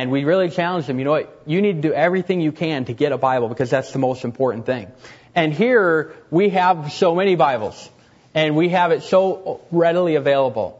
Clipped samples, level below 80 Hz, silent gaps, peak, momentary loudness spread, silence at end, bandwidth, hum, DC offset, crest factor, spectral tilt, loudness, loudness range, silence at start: under 0.1%; -62 dBFS; none; -2 dBFS; 7 LU; 0.05 s; 8 kHz; none; under 0.1%; 16 dB; -7 dB/octave; -19 LUFS; 2 LU; 0 s